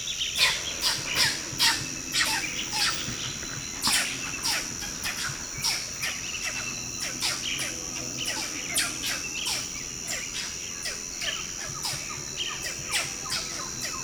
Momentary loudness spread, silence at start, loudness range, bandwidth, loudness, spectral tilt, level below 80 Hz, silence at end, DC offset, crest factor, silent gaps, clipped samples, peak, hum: 8 LU; 0 s; 5 LU; over 20 kHz; -27 LUFS; -0.5 dB/octave; -52 dBFS; 0 s; under 0.1%; 22 dB; none; under 0.1%; -8 dBFS; none